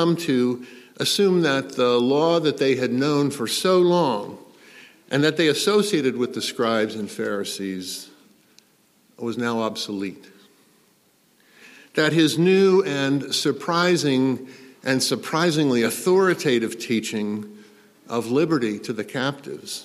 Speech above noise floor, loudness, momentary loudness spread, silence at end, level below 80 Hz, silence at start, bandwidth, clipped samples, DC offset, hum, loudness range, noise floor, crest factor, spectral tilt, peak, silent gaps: 39 dB; -22 LUFS; 12 LU; 0 s; -72 dBFS; 0 s; 15 kHz; under 0.1%; under 0.1%; none; 9 LU; -61 dBFS; 18 dB; -4.5 dB/octave; -4 dBFS; none